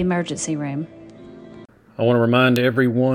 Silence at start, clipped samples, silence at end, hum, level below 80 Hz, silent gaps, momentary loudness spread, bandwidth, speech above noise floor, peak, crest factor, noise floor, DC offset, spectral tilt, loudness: 0 s; under 0.1%; 0 s; none; -54 dBFS; none; 19 LU; 18 kHz; 25 dB; -4 dBFS; 16 dB; -44 dBFS; under 0.1%; -6 dB/octave; -19 LUFS